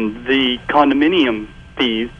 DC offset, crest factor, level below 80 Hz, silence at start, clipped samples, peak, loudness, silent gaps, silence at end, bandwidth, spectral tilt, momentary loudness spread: under 0.1%; 16 dB; -44 dBFS; 0 s; under 0.1%; -2 dBFS; -16 LUFS; none; 0.05 s; 7 kHz; -6 dB/octave; 9 LU